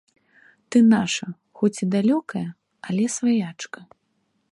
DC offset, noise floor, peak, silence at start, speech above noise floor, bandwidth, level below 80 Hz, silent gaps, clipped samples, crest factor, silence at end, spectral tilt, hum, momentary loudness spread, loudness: under 0.1%; -70 dBFS; -6 dBFS; 0.7 s; 49 dB; 11.5 kHz; -68 dBFS; none; under 0.1%; 16 dB; 0.7 s; -5 dB/octave; none; 19 LU; -22 LUFS